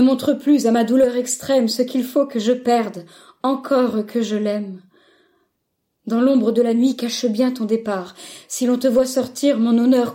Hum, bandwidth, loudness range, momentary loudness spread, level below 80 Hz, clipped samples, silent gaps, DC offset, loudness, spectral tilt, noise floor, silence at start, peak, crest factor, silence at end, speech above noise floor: none; 16.5 kHz; 4 LU; 11 LU; -64 dBFS; under 0.1%; none; under 0.1%; -19 LUFS; -4.5 dB/octave; -73 dBFS; 0 s; -6 dBFS; 12 dB; 0 s; 55 dB